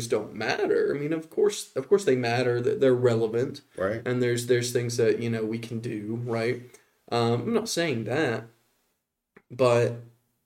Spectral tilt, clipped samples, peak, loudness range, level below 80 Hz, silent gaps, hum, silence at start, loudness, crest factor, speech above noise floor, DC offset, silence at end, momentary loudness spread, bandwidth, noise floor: -5.5 dB/octave; under 0.1%; -10 dBFS; 4 LU; -68 dBFS; none; none; 0 s; -26 LUFS; 16 dB; 52 dB; under 0.1%; 0.4 s; 10 LU; 16.5 kHz; -78 dBFS